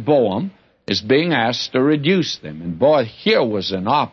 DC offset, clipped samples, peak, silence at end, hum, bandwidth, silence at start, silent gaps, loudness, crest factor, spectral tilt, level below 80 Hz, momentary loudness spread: under 0.1%; under 0.1%; -2 dBFS; 0.05 s; none; 7 kHz; 0 s; none; -18 LUFS; 16 dB; -5.5 dB/octave; -58 dBFS; 10 LU